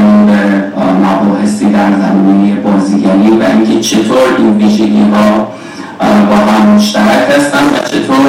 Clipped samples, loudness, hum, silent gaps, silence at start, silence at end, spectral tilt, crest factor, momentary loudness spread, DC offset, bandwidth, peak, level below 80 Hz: 0.7%; -8 LUFS; none; none; 0 s; 0 s; -6 dB/octave; 8 dB; 5 LU; under 0.1%; 15 kHz; 0 dBFS; -44 dBFS